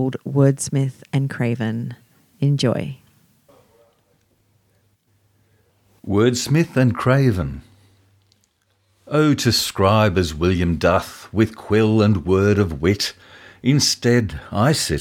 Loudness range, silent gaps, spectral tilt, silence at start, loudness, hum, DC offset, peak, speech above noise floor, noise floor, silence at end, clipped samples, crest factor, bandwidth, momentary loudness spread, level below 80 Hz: 9 LU; none; -5.5 dB/octave; 0 s; -19 LUFS; none; under 0.1%; -2 dBFS; 46 dB; -64 dBFS; 0 s; under 0.1%; 18 dB; 17 kHz; 9 LU; -42 dBFS